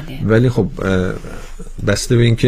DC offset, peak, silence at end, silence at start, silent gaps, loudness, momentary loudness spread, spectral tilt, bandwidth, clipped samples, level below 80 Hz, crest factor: under 0.1%; 0 dBFS; 0 s; 0 s; none; -16 LUFS; 20 LU; -6 dB/octave; 15 kHz; under 0.1%; -30 dBFS; 16 dB